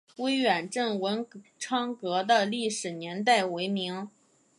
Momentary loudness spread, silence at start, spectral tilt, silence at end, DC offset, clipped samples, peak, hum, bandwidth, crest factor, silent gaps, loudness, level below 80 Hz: 10 LU; 0.2 s; -3.5 dB/octave; 0.5 s; under 0.1%; under 0.1%; -10 dBFS; none; 11.5 kHz; 18 dB; none; -28 LUFS; -82 dBFS